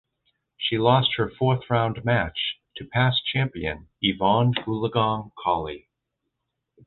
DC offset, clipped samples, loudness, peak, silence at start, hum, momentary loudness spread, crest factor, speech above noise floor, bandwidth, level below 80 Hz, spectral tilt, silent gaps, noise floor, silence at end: under 0.1%; under 0.1%; -24 LUFS; -4 dBFS; 0.6 s; none; 9 LU; 20 dB; 57 dB; 4.3 kHz; -50 dBFS; -9.5 dB/octave; none; -80 dBFS; 1.1 s